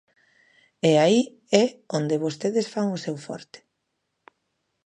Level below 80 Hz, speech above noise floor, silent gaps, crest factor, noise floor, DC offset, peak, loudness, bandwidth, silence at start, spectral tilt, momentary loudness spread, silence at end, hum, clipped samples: -74 dBFS; 55 dB; none; 22 dB; -78 dBFS; under 0.1%; -2 dBFS; -23 LUFS; 11 kHz; 0.85 s; -5.5 dB/octave; 14 LU; 1.3 s; none; under 0.1%